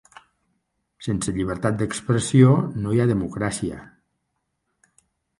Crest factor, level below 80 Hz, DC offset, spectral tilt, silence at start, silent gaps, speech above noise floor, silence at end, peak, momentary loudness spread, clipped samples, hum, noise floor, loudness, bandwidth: 20 dB; -48 dBFS; under 0.1%; -6.5 dB/octave; 1 s; none; 55 dB; 1.55 s; -2 dBFS; 13 LU; under 0.1%; none; -76 dBFS; -22 LUFS; 11.5 kHz